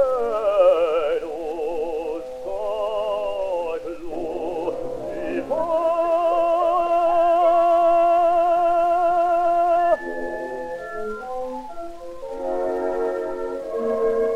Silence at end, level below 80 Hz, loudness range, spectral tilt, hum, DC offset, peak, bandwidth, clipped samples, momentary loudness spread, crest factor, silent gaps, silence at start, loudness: 0 s; -48 dBFS; 9 LU; -5.5 dB/octave; none; under 0.1%; -6 dBFS; 10.5 kHz; under 0.1%; 13 LU; 14 dB; none; 0 s; -22 LUFS